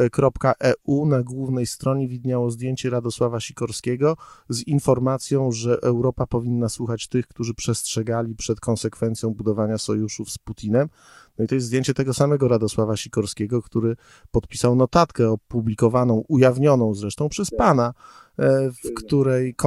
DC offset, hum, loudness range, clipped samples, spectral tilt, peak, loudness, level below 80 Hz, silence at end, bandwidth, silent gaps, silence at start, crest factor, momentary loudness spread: under 0.1%; none; 5 LU; under 0.1%; -6.5 dB/octave; -4 dBFS; -22 LUFS; -46 dBFS; 0 s; 13 kHz; none; 0 s; 18 dB; 8 LU